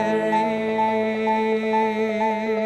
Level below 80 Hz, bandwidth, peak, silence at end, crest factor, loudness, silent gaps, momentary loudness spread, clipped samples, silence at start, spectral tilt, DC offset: -64 dBFS; 11 kHz; -10 dBFS; 0 s; 12 dB; -22 LUFS; none; 2 LU; under 0.1%; 0 s; -6 dB/octave; under 0.1%